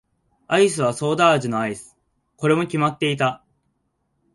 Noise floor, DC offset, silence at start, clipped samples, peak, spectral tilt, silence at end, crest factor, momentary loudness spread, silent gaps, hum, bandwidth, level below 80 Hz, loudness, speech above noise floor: -71 dBFS; under 0.1%; 0.5 s; under 0.1%; -4 dBFS; -5 dB/octave; 1 s; 18 dB; 9 LU; none; none; 11.5 kHz; -62 dBFS; -20 LUFS; 51 dB